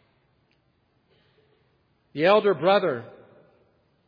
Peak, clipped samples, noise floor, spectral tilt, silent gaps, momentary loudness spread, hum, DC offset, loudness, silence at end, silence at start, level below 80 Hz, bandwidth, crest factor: -6 dBFS; under 0.1%; -68 dBFS; -7.5 dB/octave; none; 19 LU; none; under 0.1%; -22 LUFS; 1 s; 2.15 s; -78 dBFS; 5.2 kHz; 22 dB